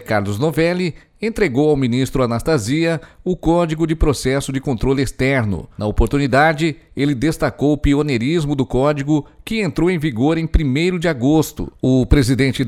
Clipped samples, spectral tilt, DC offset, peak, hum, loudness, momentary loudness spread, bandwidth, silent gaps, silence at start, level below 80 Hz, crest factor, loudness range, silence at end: under 0.1%; -6.5 dB/octave; under 0.1%; -2 dBFS; none; -18 LUFS; 7 LU; 15.5 kHz; none; 0 s; -28 dBFS; 14 dB; 1 LU; 0 s